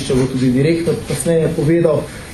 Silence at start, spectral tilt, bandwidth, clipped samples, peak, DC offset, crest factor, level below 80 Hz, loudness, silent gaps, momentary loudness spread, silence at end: 0 s; -6.5 dB/octave; 14 kHz; under 0.1%; 0 dBFS; under 0.1%; 14 dB; -38 dBFS; -16 LUFS; none; 5 LU; 0 s